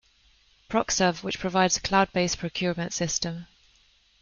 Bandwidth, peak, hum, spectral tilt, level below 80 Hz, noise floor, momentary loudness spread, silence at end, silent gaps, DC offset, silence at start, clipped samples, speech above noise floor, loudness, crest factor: 7.4 kHz; -6 dBFS; none; -3.5 dB/octave; -52 dBFS; -62 dBFS; 7 LU; 0.75 s; none; under 0.1%; 0.7 s; under 0.1%; 36 dB; -26 LUFS; 22 dB